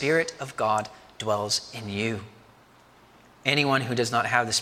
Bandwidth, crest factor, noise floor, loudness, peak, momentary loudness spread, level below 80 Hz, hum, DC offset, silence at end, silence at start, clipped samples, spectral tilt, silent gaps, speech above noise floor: 16.5 kHz; 24 dB; -55 dBFS; -26 LUFS; -4 dBFS; 10 LU; -64 dBFS; none; under 0.1%; 0 s; 0 s; under 0.1%; -3.5 dB/octave; none; 29 dB